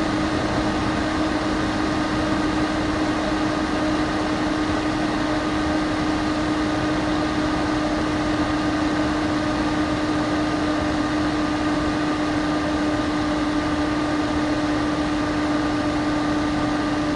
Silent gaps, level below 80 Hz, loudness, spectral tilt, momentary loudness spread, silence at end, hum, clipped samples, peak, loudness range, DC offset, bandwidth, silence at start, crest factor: none; -38 dBFS; -22 LUFS; -5.5 dB/octave; 1 LU; 0 s; none; under 0.1%; -10 dBFS; 0 LU; under 0.1%; 11 kHz; 0 s; 12 dB